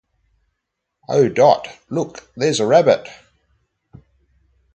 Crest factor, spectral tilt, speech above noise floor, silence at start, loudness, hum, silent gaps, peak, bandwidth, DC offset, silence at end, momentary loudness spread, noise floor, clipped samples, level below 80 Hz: 20 dB; -5 dB/octave; 61 dB; 1.1 s; -17 LUFS; none; none; 0 dBFS; 8.8 kHz; under 0.1%; 1.6 s; 13 LU; -78 dBFS; under 0.1%; -60 dBFS